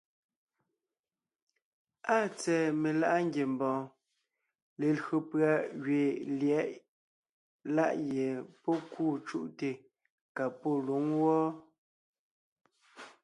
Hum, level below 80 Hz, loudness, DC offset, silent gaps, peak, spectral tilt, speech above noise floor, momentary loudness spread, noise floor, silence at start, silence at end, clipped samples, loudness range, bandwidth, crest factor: none; -82 dBFS; -32 LUFS; under 0.1%; 4.62-4.76 s, 6.88-7.23 s, 7.29-7.59 s, 10.10-10.35 s, 11.78-12.56 s; -14 dBFS; -6.5 dB/octave; over 59 dB; 11 LU; under -90 dBFS; 2.05 s; 0.15 s; under 0.1%; 3 LU; 11.5 kHz; 20 dB